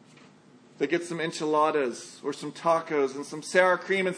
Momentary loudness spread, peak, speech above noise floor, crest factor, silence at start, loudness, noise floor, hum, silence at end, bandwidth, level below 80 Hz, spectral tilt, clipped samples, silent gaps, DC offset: 12 LU; -6 dBFS; 28 dB; 22 dB; 0.8 s; -27 LUFS; -55 dBFS; none; 0 s; 10.5 kHz; -84 dBFS; -4.5 dB/octave; under 0.1%; none; under 0.1%